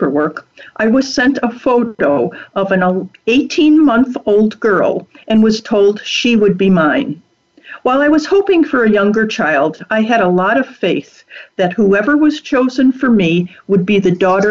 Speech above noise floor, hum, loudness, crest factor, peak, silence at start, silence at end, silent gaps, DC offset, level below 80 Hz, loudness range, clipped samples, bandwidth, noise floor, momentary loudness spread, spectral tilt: 24 dB; none; -13 LUFS; 10 dB; -4 dBFS; 0 s; 0 s; none; under 0.1%; -50 dBFS; 2 LU; under 0.1%; 7.6 kHz; -37 dBFS; 6 LU; -6 dB/octave